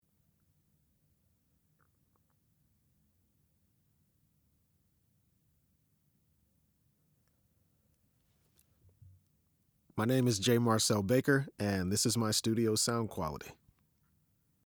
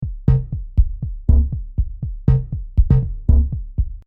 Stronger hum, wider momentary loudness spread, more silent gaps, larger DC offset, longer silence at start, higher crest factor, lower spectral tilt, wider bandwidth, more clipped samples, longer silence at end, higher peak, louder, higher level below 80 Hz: neither; first, 11 LU vs 8 LU; neither; neither; first, 9.95 s vs 0 s; first, 22 dB vs 14 dB; second, -4.5 dB/octave vs -12 dB/octave; first, over 20 kHz vs 2 kHz; neither; first, 1.15 s vs 0.05 s; second, -14 dBFS vs -2 dBFS; second, -31 LUFS vs -20 LUFS; second, -70 dBFS vs -20 dBFS